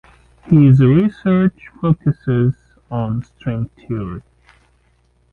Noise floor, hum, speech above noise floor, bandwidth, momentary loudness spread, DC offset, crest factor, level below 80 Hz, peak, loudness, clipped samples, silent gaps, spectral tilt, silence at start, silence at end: -58 dBFS; none; 43 dB; 4.2 kHz; 15 LU; under 0.1%; 14 dB; -44 dBFS; -2 dBFS; -16 LUFS; under 0.1%; none; -11 dB/octave; 0.45 s; 1.1 s